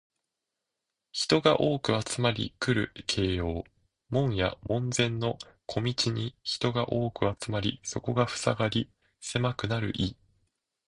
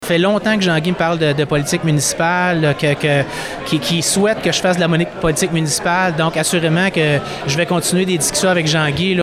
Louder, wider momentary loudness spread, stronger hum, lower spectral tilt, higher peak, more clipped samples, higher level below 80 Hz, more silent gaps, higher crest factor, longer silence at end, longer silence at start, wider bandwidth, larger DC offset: second, -29 LUFS vs -16 LUFS; first, 8 LU vs 3 LU; neither; about the same, -5 dB/octave vs -4 dB/octave; second, -8 dBFS vs -4 dBFS; neither; second, -50 dBFS vs -44 dBFS; neither; first, 22 dB vs 10 dB; first, 0.75 s vs 0 s; first, 1.15 s vs 0 s; second, 11 kHz vs 16 kHz; neither